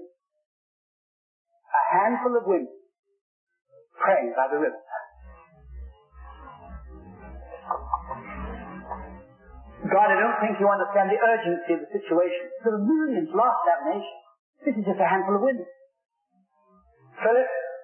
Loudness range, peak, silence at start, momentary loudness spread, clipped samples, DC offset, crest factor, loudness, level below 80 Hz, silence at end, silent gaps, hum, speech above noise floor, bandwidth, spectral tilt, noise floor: 13 LU; -8 dBFS; 0 s; 23 LU; under 0.1%; under 0.1%; 18 dB; -24 LUFS; -50 dBFS; 0 s; 0.46-1.45 s, 2.99-3.03 s, 3.21-3.47 s, 14.39-14.53 s; none; 46 dB; 3.3 kHz; -10.5 dB/octave; -69 dBFS